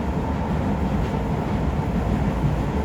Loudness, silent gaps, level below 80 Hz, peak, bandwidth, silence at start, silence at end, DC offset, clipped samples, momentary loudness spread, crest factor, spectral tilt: -24 LUFS; none; -30 dBFS; -10 dBFS; 14.5 kHz; 0 s; 0 s; under 0.1%; under 0.1%; 2 LU; 14 dB; -8 dB/octave